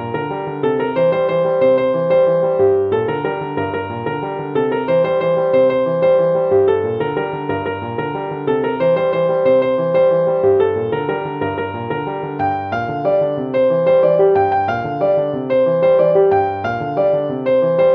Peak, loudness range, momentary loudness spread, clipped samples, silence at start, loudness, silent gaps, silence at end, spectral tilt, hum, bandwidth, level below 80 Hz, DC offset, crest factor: -2 dBFS; 3 LU; 9 LU; under 0.1%; 0 s; -16 LUFS; none; 0 s; -9 dB/octave; none; 5.2 kHz; -54 dBFS; under 0.1%; 12 dB